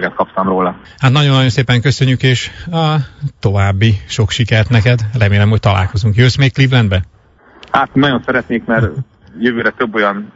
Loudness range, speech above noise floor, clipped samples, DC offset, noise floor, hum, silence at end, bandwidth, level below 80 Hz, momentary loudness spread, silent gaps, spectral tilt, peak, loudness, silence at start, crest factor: 3 LU; 30 dB; under 0.1%; under 0.1%; -42 dBFS; none; 0.05 s; 7.8 kHz; -38 dBFS; 7 LU; none; -6 dB/octave; 0 dBFS; -13 LUFS; 0 s; 12 dB